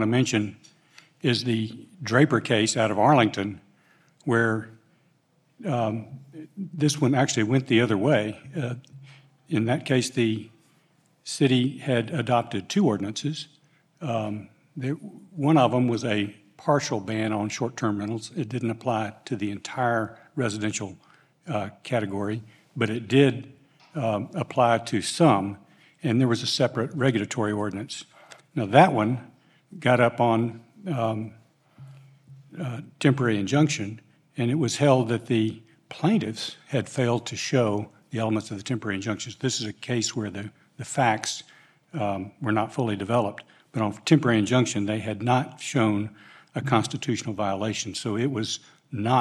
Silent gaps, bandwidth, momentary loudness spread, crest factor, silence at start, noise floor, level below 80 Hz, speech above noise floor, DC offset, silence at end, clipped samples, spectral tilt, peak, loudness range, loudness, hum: none; 13 kHz; 15 LU; 22 dB; 0 s; -66 dBFS; -72 dBFS; 41 dB; under 0.1%; 0 s; under 0.1%; -5.5 dB/octave; -4 dBFS; 5 LU; -25 LUFS; none